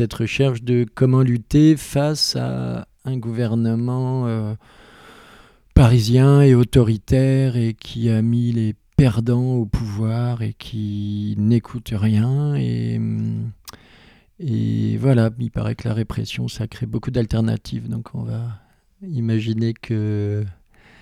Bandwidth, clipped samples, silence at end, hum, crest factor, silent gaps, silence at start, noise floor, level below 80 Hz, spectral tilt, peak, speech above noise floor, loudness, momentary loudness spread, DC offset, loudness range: 13.5 kHz; under 0.1%; 0.5 s; none; 20 dB; none; 0 s; -50 dBFS; -36 dBFS; -7.5 dB/octave; 0 dBFS; 31 dB; -20 LUFS; 13 LU; under 0.1%; 8 LU